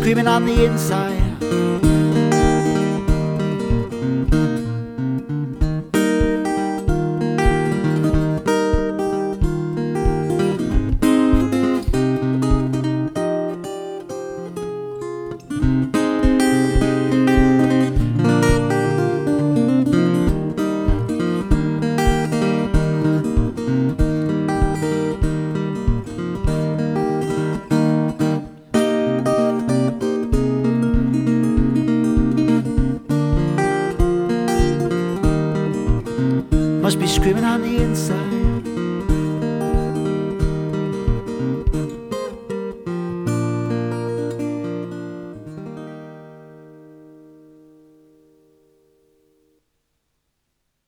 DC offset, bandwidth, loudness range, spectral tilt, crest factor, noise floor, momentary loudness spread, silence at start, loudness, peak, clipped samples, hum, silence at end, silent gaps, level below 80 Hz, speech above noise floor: under 0.1%; 17 kHz; 7 LU; -7 dB/octave; 16 dB; -72 dBFS; 10 LU; 0 s; -20 LUFS; -2 dBFS; under 0.1%; none; 3.9 s; none; -28 dBFS; 56 dB